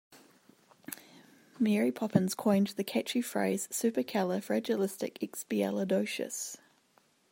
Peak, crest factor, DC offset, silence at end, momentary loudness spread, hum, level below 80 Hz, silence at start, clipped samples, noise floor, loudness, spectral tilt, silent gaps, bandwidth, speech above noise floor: -10 dBFS; 22 dB; under 0.1%; 0.75 s; 14 LU; none; -78 dBFS; 0.1 s; under 0.1%; -69 dBFS; -32 LUFS; -5 dB/octave; none; 16.5 kHz; 38 dB